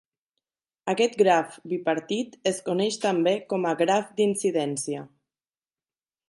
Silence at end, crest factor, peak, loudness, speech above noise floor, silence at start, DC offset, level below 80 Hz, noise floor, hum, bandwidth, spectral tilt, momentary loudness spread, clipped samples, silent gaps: 1.2 s; 18 dB; -8 dBFS; -25 LUFS; over 65 dB; 0.85 s; under 0.1%; -76 dBFS; under -90 dBFS; none; 11.5 kHz; -4.5 dB/octave; 9 LU; under 0.1%; none